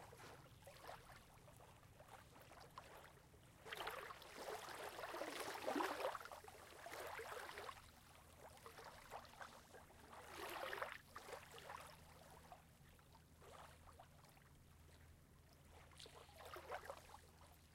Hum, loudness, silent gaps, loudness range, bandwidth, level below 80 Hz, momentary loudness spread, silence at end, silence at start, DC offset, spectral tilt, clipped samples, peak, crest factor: none; -54 LUFS; none; 15 LU; 16.5 kHz; -76 dBFS; 18 LU; 0 s; 0 s; under 0.1%; -3.5 dB/octave; under 0.1%; -30 dBFS; 26 dB